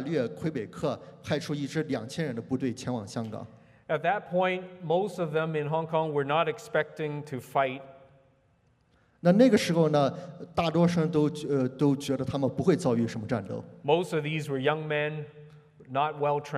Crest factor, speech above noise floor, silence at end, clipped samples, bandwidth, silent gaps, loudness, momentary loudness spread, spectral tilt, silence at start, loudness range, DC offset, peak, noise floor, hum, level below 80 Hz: 20 dB; 39 dB; 0 s; under 0.1%; 13.5 kHz; none; -28 LUFS; 10 LU; -6.5 dB/octave; 0 s; 6 LU; under 0.1%; -8 dBFS; -66 dBFS; none; -66 dBFS